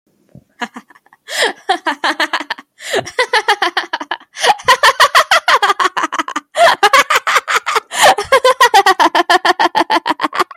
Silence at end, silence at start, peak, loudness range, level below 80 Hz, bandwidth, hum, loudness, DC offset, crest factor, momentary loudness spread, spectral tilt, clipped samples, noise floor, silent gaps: 0.15 s; 0.6 s; 0 dBFS; 6 LU; -58 dBFS; 17 kHz; none; -12 LUFS; under 0.1%; 14 dB; 13 LU; -0.5 dB/octave; under 0.1%; -45 dBFS; none